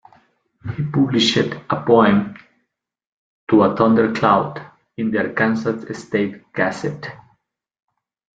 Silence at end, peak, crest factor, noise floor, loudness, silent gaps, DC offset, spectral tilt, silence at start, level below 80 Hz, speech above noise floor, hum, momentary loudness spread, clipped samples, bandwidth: 1.2 s; 0 dBFS; 20 dB; -73 dBFS; -18 LUFS; 3.12-3.47 s; under 0.1%; -6 dB/octave; 0.65 s; -56 dBFS; 56 dB; none; 18 LU; under 0.1%; 7.8 kHz